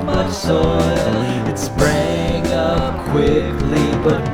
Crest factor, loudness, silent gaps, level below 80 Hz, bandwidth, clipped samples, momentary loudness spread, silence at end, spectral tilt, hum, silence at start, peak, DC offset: 16 dB; -17 LUFS; none; -28 dBFS; 19 kHz; under 0.1%; 3 LU; 0 s; -6 dB/octave; none; 0 s; -2 dBFS; under 0.1%